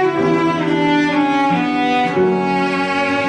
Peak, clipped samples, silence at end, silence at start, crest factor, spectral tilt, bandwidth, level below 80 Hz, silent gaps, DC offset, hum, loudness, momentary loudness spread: -6 dBFS; under 0.1%; 0 s; 0 s; 10 dB; -6 dB/octave; 10 kHz; -54 dBFS; none; under 0.1%; none; -16 LUFS; 2 LU